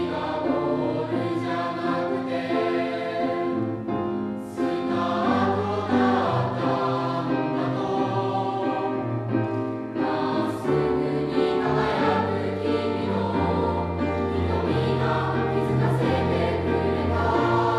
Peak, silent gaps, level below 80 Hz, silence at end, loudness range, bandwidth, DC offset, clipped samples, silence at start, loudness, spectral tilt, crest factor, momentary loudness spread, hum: -8 dBFS; none; -46 dBFS; 0 s; 2 LU; 12 kHz; under 0.1%; under 0.1%; 0 s; -25 LUFS; -8 dB/octave; 16 dB; 5 LU; none